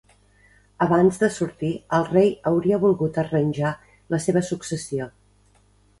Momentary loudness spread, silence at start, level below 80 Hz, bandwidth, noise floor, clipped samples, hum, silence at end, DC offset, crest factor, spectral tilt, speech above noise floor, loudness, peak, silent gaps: 10 LU; 0.8 s; -56 dBFS; 11.5 kHz; -58 dBFS; under 0.1%; 50 Hz at -45 dBFS; 0.9 s; under 0.1%; 18 dB; -6.5 dB/octave; 37 dB; -22 LUFS; -6 dBFS; none